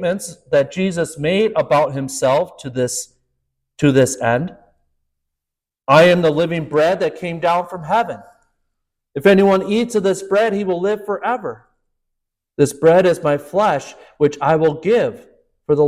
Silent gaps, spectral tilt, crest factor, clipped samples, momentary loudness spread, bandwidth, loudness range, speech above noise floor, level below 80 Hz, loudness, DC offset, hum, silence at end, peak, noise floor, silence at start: none; -5.5 dB/octave; 16 dB; under 0.1%; 12 LU; 15.5 kHz; 3 LU; 68 dB; -54 dBFS; -17 LUFS; under 0.1%; none; 0 s; -2 dBFS; -84 dBFS; 0 s